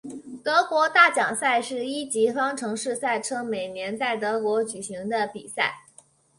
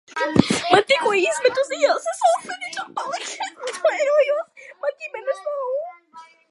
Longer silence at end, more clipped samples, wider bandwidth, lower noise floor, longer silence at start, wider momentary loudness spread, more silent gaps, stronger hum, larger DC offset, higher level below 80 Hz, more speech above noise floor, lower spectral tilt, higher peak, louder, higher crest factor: first, 0.6 s vs 0.25 s; neither; about the same, 11.5 kHz vs 11.5 kHz; first, -56 dBFS vs -47 dBFS; about the same, 0.05 s vs 0.1 s; about the same, 12 LU vs 12 LU; neither; neither; neither; second, -72 dBFS vs -56 dBFS; first, 31 dB vs 26 dB; second, -2.5 dB/octave vs -4 dB/octave; second, -4 dBFS vs 0 dBFS; second, -24 LUFS vs -21 LUFS; about the same, 22 dB vs 22 dB